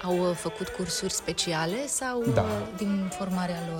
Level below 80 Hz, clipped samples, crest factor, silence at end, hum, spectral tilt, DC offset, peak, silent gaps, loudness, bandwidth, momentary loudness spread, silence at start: -52 dBFS; under 0.1%; 20 dB; 0 s; none; -4 dB/octave; under 0.1%; -10 dBFS; none; -29 LUFS; 17 kHz; 4 LU; 0 s